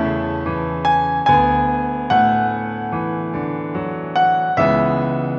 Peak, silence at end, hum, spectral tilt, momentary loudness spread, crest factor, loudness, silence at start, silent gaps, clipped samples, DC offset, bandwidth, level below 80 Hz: -4 dBFS; 0 s; none; -8 dB/octave; 9 LU; 14 dB; -18 LUFS; 0 s; none; under 0.1%; under 0.1%; 7 kHz; -40 dBFS